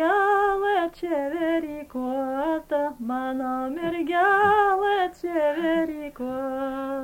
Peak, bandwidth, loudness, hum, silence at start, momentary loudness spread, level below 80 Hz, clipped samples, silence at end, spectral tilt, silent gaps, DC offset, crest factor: -8 dBFS; 17 kHz; -24 LUFS; none; 0 s; 10 LU; -54 dBFS; under 0.1%; 0 s; -5.5 dB/octave; none; under 0.1%; 16 dB